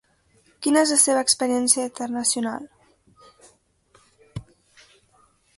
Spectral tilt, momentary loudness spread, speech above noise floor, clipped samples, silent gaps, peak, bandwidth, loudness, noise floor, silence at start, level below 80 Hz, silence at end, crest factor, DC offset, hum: -2 dB/octave; 23 LU; 40 dB; under 0.1%; none; -2 dBFS; 12 kHz; -20 LUFS; -61 dBFS; 0.6 s; -62 dBFS; 1.15 s; 24 dB; under 0.1%; none